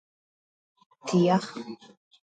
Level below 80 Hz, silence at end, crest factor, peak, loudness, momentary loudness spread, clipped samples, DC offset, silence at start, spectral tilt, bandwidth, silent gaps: -72 dBFS; 0.6 s; 20 dB; -10 dBFS; -25 LUFS; 20 LU; under 0.1%; under 0.1%; 1.05 s; -6.5 dB/octave; 9.2 kHz; none